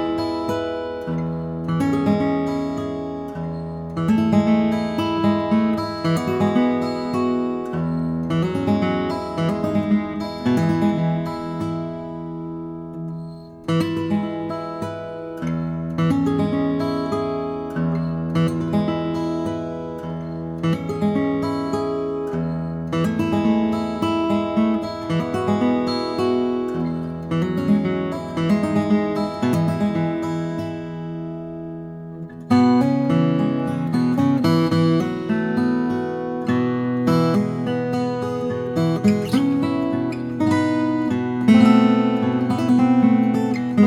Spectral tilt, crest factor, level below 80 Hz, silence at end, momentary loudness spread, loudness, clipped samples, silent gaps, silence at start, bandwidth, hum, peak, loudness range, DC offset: -7.5 dB/octave; 18 dB; -50 dBFS; 0 s; 11 LU; -21 LUFS; under 0.1%; none; 0 s; 13.5 kHz; none; -2 dBFS; 6 LU; under 0.1%